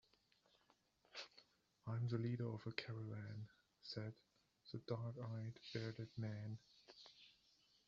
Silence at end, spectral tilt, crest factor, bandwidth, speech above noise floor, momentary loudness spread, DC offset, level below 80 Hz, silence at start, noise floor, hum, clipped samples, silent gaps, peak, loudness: 0.55 s; -6 dB/octave; 28 dB; 7.4 kHz; 31 dB; 18 LU; under 0.1%; -82 dBFS; 1.15 s; -79 dBFS; none; under 0.1%; none; -22 dBFS; -50 LUFS